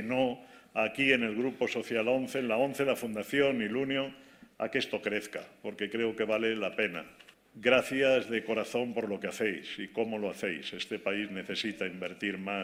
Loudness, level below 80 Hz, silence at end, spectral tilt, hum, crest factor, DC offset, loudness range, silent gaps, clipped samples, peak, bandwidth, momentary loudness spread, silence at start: -32 LUFS; -70 dBFS; 0 s; -4.5 dB/octave; none; 22 dB; under 0.1%; 4 LU; none; under 0.1%; -10 dBFS; 16 kHz; 10 LU; 0 s